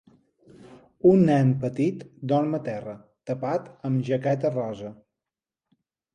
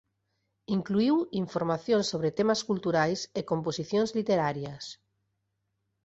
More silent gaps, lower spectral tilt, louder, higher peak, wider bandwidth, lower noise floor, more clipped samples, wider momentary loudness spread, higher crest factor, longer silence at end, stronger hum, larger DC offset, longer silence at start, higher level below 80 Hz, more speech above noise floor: neither; first, -9 dB/octave vs -5.5 dB/octave; first, -24 LUFS vs -29 LUFS; first, -6 dBFS vs -12 dBFS; first, 9.6 kHz vs 8 kHz; first, -89 dBFS vs -79 dBFS; neither; first, 17 LU vs 7 LU; about the same, 20 dB vs 18 dB; about the same, 1.2 s vs 1.1 s; neither; neither; about the same, 0.7 s vs 0.7 s; about the same, -64 dBFS vs -66 dBFS; first, 66 dB vs 51 dB